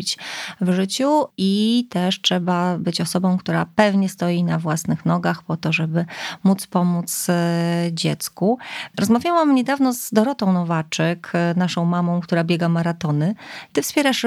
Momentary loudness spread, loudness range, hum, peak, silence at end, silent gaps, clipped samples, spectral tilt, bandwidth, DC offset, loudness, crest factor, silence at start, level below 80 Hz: 6 LU; 2 LU; none; 0 dBFS; 0 s; none; under 0.1%; -5.5 dB/octave; 15.5 kHz; under 0.1%; -20 LUFS; 18 dB; 0 s; -64 dBFS